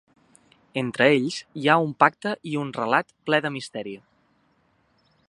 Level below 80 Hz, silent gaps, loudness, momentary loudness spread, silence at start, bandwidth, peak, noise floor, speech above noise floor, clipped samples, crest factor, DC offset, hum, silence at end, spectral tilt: -72 dBFS; none; -23 LUFS; 14 LU; 0.75 s; 11 kHz; -2 dBFS; -65 dBFS; 42 dB; under 0.1%; 24 dB; under 0.1%; none; 1.3 s; -5.5 dB/octave